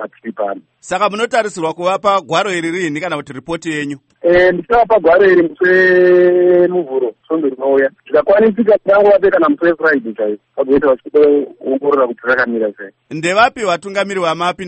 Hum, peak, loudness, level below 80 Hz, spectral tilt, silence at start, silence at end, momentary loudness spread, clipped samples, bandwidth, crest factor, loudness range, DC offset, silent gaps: none; 0 dBFS; -13 LUFS; -48 dBFS; -5 dB/octave; 0 s; 0 s; 12 LU; under 0.1%; 8.8 kHz; 14 dB; 6 LU; under 0.1%; none